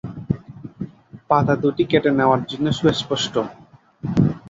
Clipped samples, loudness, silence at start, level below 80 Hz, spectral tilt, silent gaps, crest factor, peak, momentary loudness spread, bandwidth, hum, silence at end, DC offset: under 0.1%; -20 LUFS; 0.05 s; -48 dBFS; -6 dB/octave; none; 18 dB; -2 dBFS; 17 LU; 7.8 kHz; none; 0 s; under 0.1%